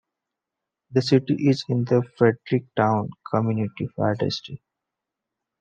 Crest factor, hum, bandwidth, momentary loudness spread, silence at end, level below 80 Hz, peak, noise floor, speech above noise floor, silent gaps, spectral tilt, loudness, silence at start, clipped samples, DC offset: 20 dB; none; 8.8 kHz; 7 LU; 1.05 s; -68 dBFS; -4 dBFS; -85 dBFS; 63 dB; none; -7.5 dB/octave; -23 LUFS; 0.9 s; under 0.1%; under 0.1%